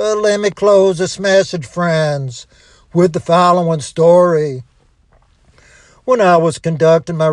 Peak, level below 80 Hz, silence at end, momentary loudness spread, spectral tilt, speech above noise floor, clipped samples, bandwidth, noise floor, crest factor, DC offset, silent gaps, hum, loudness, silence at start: 0 dBFS; -52 dBFS; 0 s; 11 LU; -5.5 dB/octave; 39 dB; under 0.1%; 11 kHz; -52 dBFS; 12 dB; under 0.1%; none; none; -13 LUFS; 0 s